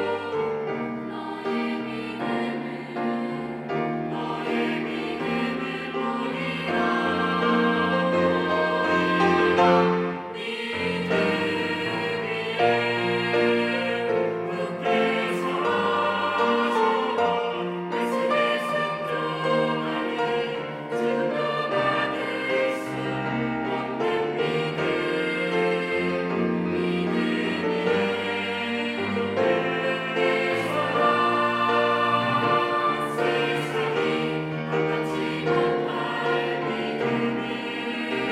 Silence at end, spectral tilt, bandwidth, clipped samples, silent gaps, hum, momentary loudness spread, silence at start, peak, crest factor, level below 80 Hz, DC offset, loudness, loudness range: 0 s; -6 dB/octave; 13.5 kHz; under 0.1%; none; none; 7 LU; 0 s; -8 dBFS; 18 dB; -66 dBFS; under 0.1%; -25 LUFS; 5 LU